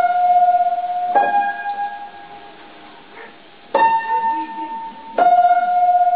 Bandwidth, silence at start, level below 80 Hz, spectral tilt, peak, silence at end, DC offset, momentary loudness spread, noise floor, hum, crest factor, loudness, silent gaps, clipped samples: 4.6 kHz; 0 s; -66 dBFS; -8 dB/octave; -2 dBFS; 0 s; 0.4%; 17 LU; -42 dBFS; none; 14 dB; -17 LUFS; none; under 0.1%